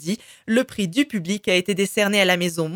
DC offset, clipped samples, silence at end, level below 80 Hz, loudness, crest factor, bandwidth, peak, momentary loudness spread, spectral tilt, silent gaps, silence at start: under 0.1%; under 0.1%; 0 s; -62 dBFS; -21 LUFS; 18 dB; 18.5 kHz; -4 dBFS; 7 LU; -4 dB/octave; none; 0 s